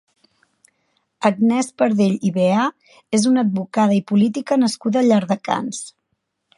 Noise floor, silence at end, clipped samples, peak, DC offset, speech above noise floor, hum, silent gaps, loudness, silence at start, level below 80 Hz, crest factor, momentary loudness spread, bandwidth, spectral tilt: -73 dBFS; 0.7 s; under 0.1%; -2 dBFS; under 0.1%; 56 dB; none; none; -18 LUFS; 1.2 s; -68 dBFS; 18 dB; 7 LU; 11.5 kHz; -6 dB/octave